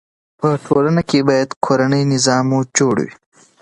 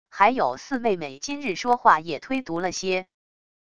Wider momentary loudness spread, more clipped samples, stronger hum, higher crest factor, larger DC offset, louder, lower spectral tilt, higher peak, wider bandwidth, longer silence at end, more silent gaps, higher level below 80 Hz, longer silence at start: second, 5 LU vs 10 LU; neither; neither; second, 16 dB vs 22 dB; second, under 0.1% vs 0.5%; first, -16 LUFS vs -24 LUFS; first, -5 dB/octave vs -3.5 dB/octave; about the same, 0 dBFS vs -2 dBFS; about the same, 11.5 kHz vs 11 kHz; second, 0.5 s vs 0.65 s; first, 1.56-1.61 s vs none; first, -54 dBFS vs -60 dBFS; first, 0.4 s vs 0.05 s